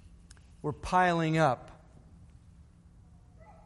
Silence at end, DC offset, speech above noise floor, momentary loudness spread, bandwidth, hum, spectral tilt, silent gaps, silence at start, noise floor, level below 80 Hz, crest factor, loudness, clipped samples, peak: 1.95 s; under 0.1%; 29 dB; 13 LU; 11.5 kHz; none; -6.5 dB/octave; none; 0.65 s; -57 dBFS; -54 dBFS; 20 dB; -29 LUFS; under 0.1%; -12 dBFS